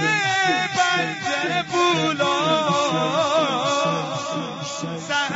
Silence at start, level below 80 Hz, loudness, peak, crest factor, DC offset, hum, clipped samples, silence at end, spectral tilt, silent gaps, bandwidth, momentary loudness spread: 0 s; -66 dBFS; -21 LUFS; -6 dBFS; 16 dB; under 0.1%; none; under 0.1%; 0 s; -3.5 dB/octave; none; 8 kHz; 9 LU